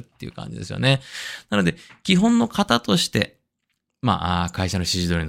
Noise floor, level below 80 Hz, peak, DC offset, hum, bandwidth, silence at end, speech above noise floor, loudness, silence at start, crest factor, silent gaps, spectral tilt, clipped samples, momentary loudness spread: -76 dBFS; -48 dBFS; 0 dBFS; under 0.1%; none; 16 kHz; 0 s; 54 dB; -21 LUFS; 0.2 s; 22 dB; none; -5 dB/octave; under 0.1%; 13 LU